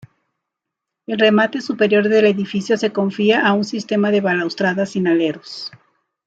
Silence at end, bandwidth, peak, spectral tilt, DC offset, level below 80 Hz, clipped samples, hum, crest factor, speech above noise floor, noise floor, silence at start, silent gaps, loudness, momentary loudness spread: 0.6 s; 8 kHz; -2 dBFS; -6 dB/octave; under 0.1%; -66 dBFS; under 0.1%; none; 16 dB; 65 dB; -82 dBFS; 1.1 s; none; -17 LUFS; 9 LU